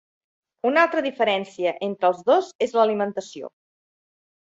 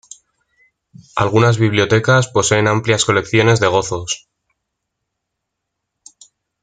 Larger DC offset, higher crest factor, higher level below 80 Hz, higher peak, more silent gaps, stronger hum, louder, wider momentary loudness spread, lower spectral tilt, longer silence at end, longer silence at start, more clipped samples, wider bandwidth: neither; about the same, 20 dB vs 16 dB; second, -74 dBFS vs -50 dBFS; about the same, -2 dBFS vs -2 dBFS; first, 2.55-2.59 s vs none; neither; second, -22 LUFS vs -15 LUFS; first, 13 LU vs 9 LU; about the same, -4.5 dB/octave vs -4.5 dB/octave; second, 1.1 s vs 2.45 s; second, 0.65 s vs 1.15 s; neither; second, 8 kHz vs 9.4 kHz